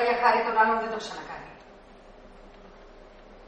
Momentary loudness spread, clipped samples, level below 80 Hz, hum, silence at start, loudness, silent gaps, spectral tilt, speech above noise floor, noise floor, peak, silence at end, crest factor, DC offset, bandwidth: 19 LU; under 0.1%; -56 dBFS; none; 0 s; -25 LUFS; none; -3.5 dB/octave; 25 dB; -50 dBFS; -8 dBFS; 0 s; 22 dB; under 0.1%; 8.4 kHz